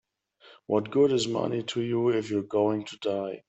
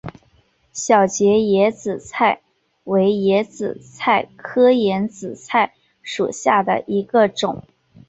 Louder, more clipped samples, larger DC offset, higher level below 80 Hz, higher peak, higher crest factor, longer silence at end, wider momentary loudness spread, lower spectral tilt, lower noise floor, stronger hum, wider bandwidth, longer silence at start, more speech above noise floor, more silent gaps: second, -27 LUFS vs -18 LUFS; neither; neither; second, -70 dBFS vs -58 dBFS; second, -10 dBFS vs -2 dBFS; about the same, 16 dB vs 16 dB; second, 0.1 s vs 0.5 s; second, 7 LU vs 13 LU; about the same, -5.5 dB/octave vs -4.5 dB/octave; about the same, -58 dBFS vs -58 dBFS; neither; about the same, 8.4 kHz vs 8.2 kHz; first, 0.5 s vs 0.05 s; second, 32 dB vs 41 dB; neither